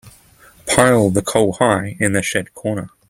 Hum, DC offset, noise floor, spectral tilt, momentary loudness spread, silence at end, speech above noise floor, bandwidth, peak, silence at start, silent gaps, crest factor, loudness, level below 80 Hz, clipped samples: none; under 0.1%; -48 dBFS; -4.5 dB/octave; 11 LU; 0.2 s; 31 dB; 16.5 kHz; 0 dBFS; 0.05 s; none; 18 dB; -16 LUFS; -46 dBFS; under 0.1%